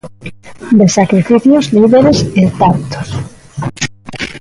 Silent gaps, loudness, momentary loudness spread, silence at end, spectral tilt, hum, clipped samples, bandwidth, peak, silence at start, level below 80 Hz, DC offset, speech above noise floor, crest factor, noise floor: none; -10 LUFS; 18 LU; 0 s; -6 dB/octave; none; under 0.1%; 11.5 kHz; 0 dBFS; 0.05 s; -38 dBFS; under 0.1%; 21 dB; 12 dB; -30 dBFS